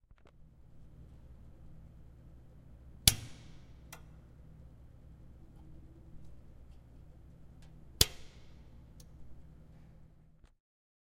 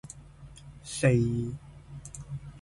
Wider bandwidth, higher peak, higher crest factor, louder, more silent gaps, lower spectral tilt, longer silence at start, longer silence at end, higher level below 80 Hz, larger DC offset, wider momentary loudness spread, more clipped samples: first, 15.5 kHz vs 11.5 kHz; first, 0 dBFS vs -12 dBFS; first, 42 dB vs 20 dB; about the same, -30 LUFS vs -29 LUFS; neither; second, -1.5 dB/octave vs -6.5 dB/octave; about the same, 0.1 s vs 0.05 s; first, 0.65 s vs 0.05 s; about the same, -52 dBFS vs -50 dBFS; neither; first, 28 LU vs 24 LU; neither